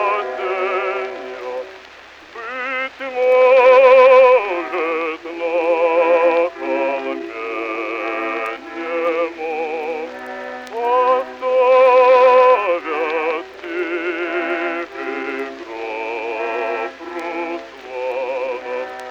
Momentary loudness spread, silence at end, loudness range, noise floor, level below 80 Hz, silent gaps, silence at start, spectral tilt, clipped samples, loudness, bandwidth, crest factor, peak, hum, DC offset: 17 LU; 0 s; 11 LU; -41 dBFS; -62 dBFS; none; 0 s; -3.5 dB/octave; under 0.1%; -17 LUFS; 7 kHz; 16 dB; 0 dBFS; none; under 0.1%